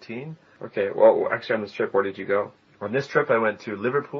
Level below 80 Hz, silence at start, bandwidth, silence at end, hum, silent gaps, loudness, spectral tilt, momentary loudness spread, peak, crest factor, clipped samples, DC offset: -74 dBFS; 0 s; 6.8 kHz; 0 s; none; none; -23 LUFS; -4.5 dB/octave; 18 LU; -4 dBFS; 20 dB; under 0.1%; under 0.1%